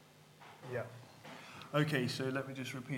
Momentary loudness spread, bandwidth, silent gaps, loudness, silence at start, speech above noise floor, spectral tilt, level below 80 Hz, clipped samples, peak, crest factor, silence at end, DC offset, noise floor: 20 LU; 16.5 kHz; none; -38 LUFS; 0 s; 22 dB; -5.5 dB/octave; -82 dBFS; under 0.1%; -18 dBFS; 22 dB; 0 s; under 0.1%; -59 dBFS